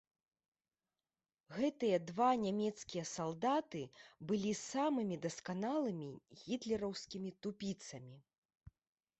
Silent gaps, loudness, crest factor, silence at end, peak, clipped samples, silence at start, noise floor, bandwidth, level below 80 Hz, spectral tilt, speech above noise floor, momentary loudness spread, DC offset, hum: 8.38-8.49 s; -39 LUFS; 20 dB; 0.5 s; -22 dBFS; under 0.1%; 1.5 s; under -90 dBFS; 8.2 kHz; -74 dBFS; -5 dB/octave; over 51 dB; 16 LU; under 0.1%; none